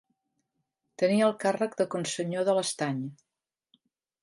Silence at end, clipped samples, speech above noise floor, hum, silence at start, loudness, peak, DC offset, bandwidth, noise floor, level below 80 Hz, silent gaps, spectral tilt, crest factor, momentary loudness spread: 1.1 s; under 0.1%; 53 dB; none; 1 s; -28 LUFS; -12 dBFS; under 0.1%; 11.5 kHz; -81 dBFS; -80 dBFS; none; -4.5 dB/octave; 18 dB; 8 LU